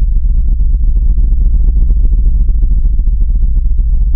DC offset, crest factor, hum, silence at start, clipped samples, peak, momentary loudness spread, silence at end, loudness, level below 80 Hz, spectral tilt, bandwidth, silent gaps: under 0.1%; 8 dB; none; 0 s; under 0.1%; 0 dBFS; 2 LU; 0 s; -15 LUFS; -8 dBFS; -16 dB/octave; 0.7 kHz; none